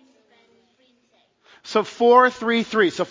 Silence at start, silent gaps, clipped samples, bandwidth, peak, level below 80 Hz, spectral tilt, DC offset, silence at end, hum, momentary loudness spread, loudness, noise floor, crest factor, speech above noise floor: 1.65 s; none; under 0.1%; 7.6 kHz; -2 dBFS; -68 dBFS; -4.5 dB/octave; under 0.1%; 0.05 s; none; 10 LU; -18 LUFS; -63 dBFS; 20 dB; 45 dB